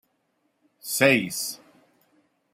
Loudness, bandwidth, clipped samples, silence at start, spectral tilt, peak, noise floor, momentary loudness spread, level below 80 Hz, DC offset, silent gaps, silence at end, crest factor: -23 LUFS; 16 kHz; under 0.1%; 0.85 s; -3.5 dB/octave; -4 dBFS; -72 dBFS; 21 LU; -72 dBFS; under 0.1%; none; 0.95 s; 24 dB